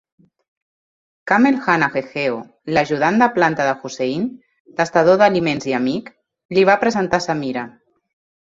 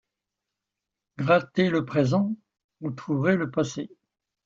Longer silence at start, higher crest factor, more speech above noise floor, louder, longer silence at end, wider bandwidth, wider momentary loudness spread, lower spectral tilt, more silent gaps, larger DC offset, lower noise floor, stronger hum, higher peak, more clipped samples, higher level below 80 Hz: about the same, 1.25 s vs 1.2 s; about the same, 18 dB vs 20 dB; first, over 73 dB vs 62 dB; first, -18 LUFS vs -25 LUFS; first, 0.75 s vs 0.6 s; about the same, 7.8 kHz vs 7.6 kHz; about the same, 12 LU vs 14 LU; second, -5.5 dB/octave vs -7 dB/octave; about the same, 4.60-4.65 s, 6.45-6.49 s vs 2.64-2.69 s; neither; first, under -90 dBFS vs -86 dBFS; neither; first, -2 dBFS vs -8 dBFS; neither; first, -56 dBFS vs -64 dBFS